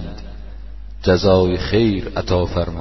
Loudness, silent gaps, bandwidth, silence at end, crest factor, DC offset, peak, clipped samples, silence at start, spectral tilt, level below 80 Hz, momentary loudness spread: -17 LUFS; none; 6.2 kHz; 0 s; 16 dB; 1%; -2 dBFS; under 0.1%; 0 s; -7 dB/octave; -32 dBFS; 23 LU